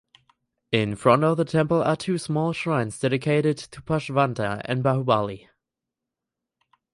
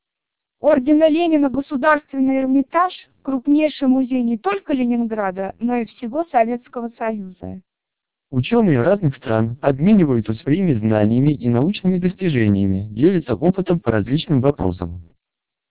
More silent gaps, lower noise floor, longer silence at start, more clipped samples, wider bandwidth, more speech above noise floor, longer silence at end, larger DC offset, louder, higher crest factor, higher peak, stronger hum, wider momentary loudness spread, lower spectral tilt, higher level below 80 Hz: neither; about the same, -86 dBFS vs -84 dBFS; about the same, 0.7 s vs 0.65 s; neither; first, 11.5 kHz vs 4 kHz; about the same, 63 dB vs 66 dB; first, 1.55 s vs 0.7 s; second, under 0.1% vs 0.3%; second, -23 LUFS vs -18 LUFS; about the same, 20 dB vs 16 dB; about the same, -4 dBFS vs -2 dBFS; neither; about the same, 8 LU vs 10 LU; second, -6.5 dB/octave vs -12 dB/octave; second, -56 dBFS vs -44 dBFS